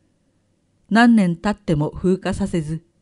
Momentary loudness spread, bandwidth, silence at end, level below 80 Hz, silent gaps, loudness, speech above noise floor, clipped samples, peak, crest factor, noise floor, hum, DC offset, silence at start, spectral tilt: 10 LU; 11 kHz; 0.25 s; -42 dBFS; none; -19 LUFS; 46 dB; under 0.1%; -2 dBFS; 18 dB; -64 dBFS; none; under 0.1%; 0.9 s; -7 dB/octave